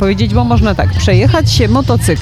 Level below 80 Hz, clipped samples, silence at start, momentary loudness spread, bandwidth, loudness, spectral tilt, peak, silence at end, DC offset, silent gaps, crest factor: -20 dBFS; under 0.1%; 0 s; 3 LU; 14 kHz; -11 LUFS; -6 dB/octave; 0 dBFS; 0 s; under 0.1%; none; 10 dB